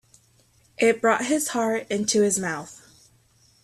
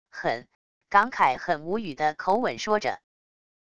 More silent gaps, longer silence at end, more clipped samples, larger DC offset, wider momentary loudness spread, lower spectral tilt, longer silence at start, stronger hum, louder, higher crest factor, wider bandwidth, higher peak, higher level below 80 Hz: second, none vs 0.55-0.81 s; first, 0.9 s vs 0.75 s; neither; second, under 0.1% vs 0.3%; about the same, 9 LU vs 9 LU; second, -3 dB/octave vs -4.5 dB/octave; first, 0.8 s vs 0.1 s; neither; first, -23 LUFS vs -26 LUFS; second, 16 dB vs 22 dB; first, 14.5 kHz vs 11 kHz; about the same, -8 dBFS vs -6 dBFS; about the same, -66 dBFS vs -62 dBFS